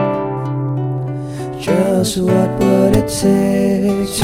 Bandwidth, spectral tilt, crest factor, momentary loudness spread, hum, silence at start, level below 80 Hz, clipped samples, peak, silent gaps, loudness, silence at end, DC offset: 16 kHz; -6 dB/octave; 14 dB; 9 LU; none; 0 s; -38 dBFS; under 0.1%; 0 dBFS; none; -16 LUFS; 0 s; under 0.1%